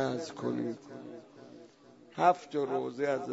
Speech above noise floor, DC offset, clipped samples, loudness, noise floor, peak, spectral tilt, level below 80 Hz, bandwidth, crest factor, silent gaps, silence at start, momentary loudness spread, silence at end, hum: 26 dB; under 0.1%; under 0.1%; -32 LUFS; -57 dBFS; -12 dBFS; -6 dB/octave; -78 dBFS; 8 kHz; 22 dB; none; 0 s; 23 LU; 0 s; none